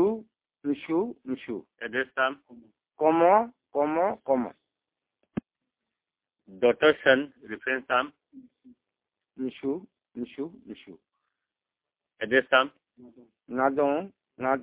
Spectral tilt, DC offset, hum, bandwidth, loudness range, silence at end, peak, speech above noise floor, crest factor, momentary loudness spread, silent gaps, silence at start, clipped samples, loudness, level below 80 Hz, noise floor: -8.5 dB/octave; under 0.1%; none; 4 kHz; 12 LU; 0 s; -6 dBFS; 63 dB; 24 dB; 17 LU; none; 0 s; under 0.1%; -27 LUFS; -68 dBFS; -90 dBFS